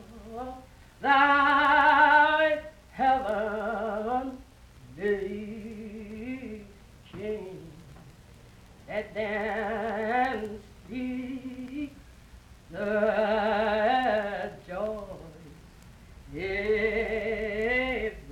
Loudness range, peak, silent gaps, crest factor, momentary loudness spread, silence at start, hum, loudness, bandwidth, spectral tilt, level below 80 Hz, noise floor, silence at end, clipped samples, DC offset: 14 LU; -8 dBFS; none; 20 dB; 22 LU; 0 s; none; -27 LUFS; 15.5 kHz; -5.5 dB/octave; -52 dBFS; -52 dBFS; 0 s; under 0.1%; under 0.1%